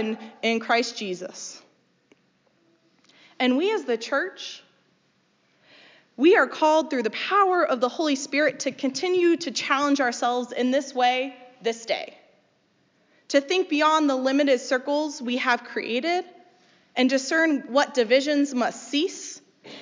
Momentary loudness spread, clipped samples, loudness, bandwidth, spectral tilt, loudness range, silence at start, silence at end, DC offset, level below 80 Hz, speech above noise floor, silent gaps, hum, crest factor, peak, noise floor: 12 LU; under 0.1%; -23 LUFS; 7.6 kHz; -2.5 dB/octave; 6 LU; 0 s; 0 s; under 0.1%; -86 dBFS; 43 dB; none; none; 18 dB; -6 dBFS; -66 dBFS